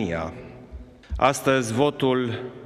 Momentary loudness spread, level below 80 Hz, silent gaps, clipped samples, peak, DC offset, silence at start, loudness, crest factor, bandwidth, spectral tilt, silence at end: 22 LU; -42 dBFS; none; under 0.1%; -2 dBFS; under 0.1%; 0 s; -23 LUFS; 22 dB; 15 kHz; -5 dB/octave; 0 s